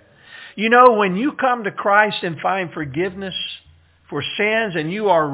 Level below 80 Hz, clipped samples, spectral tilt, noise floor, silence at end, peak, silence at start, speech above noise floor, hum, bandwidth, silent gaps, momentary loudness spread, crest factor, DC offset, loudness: -58 dBFS; under 0.1%; -9 dB/octave; -52 dBFS; 0 s; 0 dBFS; 0.3 s; 34 dB; none; 4 kHz; none; 14 LU; 18 dB; under 0.1%; -18 LUFS